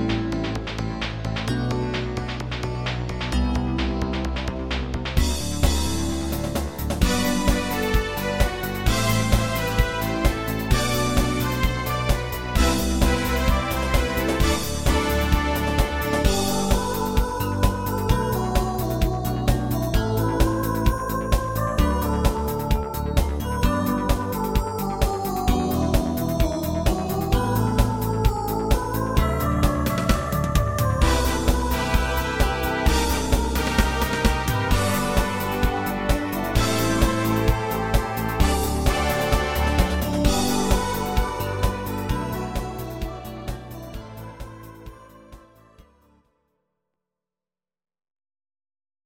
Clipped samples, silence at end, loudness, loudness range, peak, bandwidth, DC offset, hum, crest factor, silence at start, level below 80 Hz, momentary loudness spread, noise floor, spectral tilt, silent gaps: under 0.1%; 3.25 s; -23 LUFS; 4 LU; -4 dBFS; 17 kHz; under 0.1%; none; 20 dB; 0 s; -26 dBFS; 6 LU; under -90 dBFS; -5 dB/octave; none